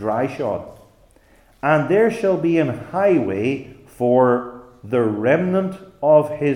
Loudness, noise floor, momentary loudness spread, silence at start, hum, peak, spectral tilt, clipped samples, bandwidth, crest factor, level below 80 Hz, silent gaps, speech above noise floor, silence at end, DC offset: -19 LUFS; -53 dBFS; 9 LU; 0 s; none; -2 dBFS; -8 dB/octave; under 0.1%; 12 kHz; 18 dB; -56 dBFS; none; 35 dB; 0 s; under 0.1%